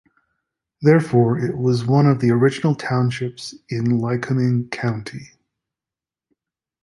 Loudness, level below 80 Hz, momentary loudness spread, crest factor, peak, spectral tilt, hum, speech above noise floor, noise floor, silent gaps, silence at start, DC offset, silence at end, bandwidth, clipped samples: -19 LUFS; -58 dBFS; 13 LU; 18 dB; -2 dBFS; -7.5 dB/octave; none; 71 dB; -89 dBFS; none; 0.8 s; under 0.1%; 1.6 s; 11.5 kHz; under 0.1%